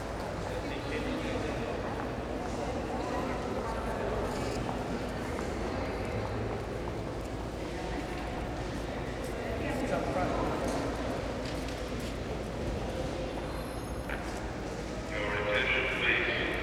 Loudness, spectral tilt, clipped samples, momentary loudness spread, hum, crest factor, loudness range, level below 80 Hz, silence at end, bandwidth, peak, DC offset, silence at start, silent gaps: -34 LUFS; -5.5 dB/octave; under 0.1%; 8 LU; none; 18 dB; 3 LU; -42 dBFS; 0 s; 16 kHz; -14 dBFS; under 0.1%; 0 s; none